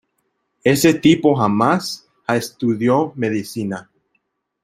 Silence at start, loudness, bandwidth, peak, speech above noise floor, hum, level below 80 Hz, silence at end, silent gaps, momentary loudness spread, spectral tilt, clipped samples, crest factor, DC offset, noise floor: 0.65 s; -18 LUFS; 16 kHz; -2 dBFS; 53 dB; none; -56 dBFS; 0.8 s; none; 13 LU; -5.5 dB/octave; under 0.1%; 18 dB; under 0.1%; -70 dBFS